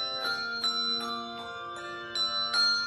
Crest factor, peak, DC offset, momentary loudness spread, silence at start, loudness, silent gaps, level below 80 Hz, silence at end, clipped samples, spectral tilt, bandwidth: 14 dB; -16 dBFS; under 0.1%; 14 LU; 0 s; -29 LUFS; none; -70 dBFS; 0 s; under 0.1%; -1 dB/octave; 13 kHz